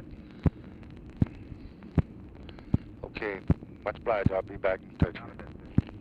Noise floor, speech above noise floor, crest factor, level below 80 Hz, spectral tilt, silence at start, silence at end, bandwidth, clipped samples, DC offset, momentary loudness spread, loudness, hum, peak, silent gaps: -46 dBFS; 16 dB; 22 dB; -42 dBFS; -10 dB/octave; 0 s; 0 s; 5.4 kHz; under 0.1%; under 0.1%; 17 LU; -32 LUFS; none; -10 dBFS; none